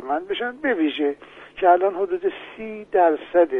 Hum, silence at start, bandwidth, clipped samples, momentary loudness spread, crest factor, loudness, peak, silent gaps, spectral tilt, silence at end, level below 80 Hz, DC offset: none; 0 s; 3.9 kHz; under 0.1%; 16 LU; 18 dB; -21 LUFS; -4 dBFS; none; -6.5 dB/octave; 0 s; -62 dBFS; under 0.1%